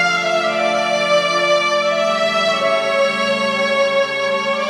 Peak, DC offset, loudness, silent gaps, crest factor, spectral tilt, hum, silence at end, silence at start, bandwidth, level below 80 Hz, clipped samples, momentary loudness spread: -4 dBFS; under 0.1%; -16 LUFS; none; 14 dB; -2.5 dB/octave; none; 0 s; 0 s; 12.5 kHz; -70 dBFS; under 0.1%; 2 LU